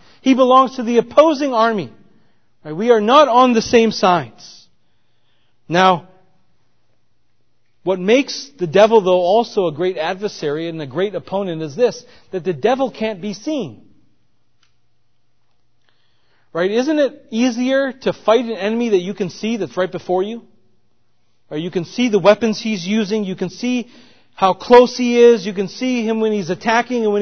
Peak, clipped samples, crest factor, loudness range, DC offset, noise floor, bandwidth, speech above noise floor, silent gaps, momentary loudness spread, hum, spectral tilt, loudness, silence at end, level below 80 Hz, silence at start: 0 dBFS; under 0.1%; 18 dB; 9 LU; 0.3%; -68 dBFS; 6.6 kHz; 52 dB; none; 13 LU; none; -5 dB/octave; -16 LUFS; 0 s; -58 dBFS; 0.25 s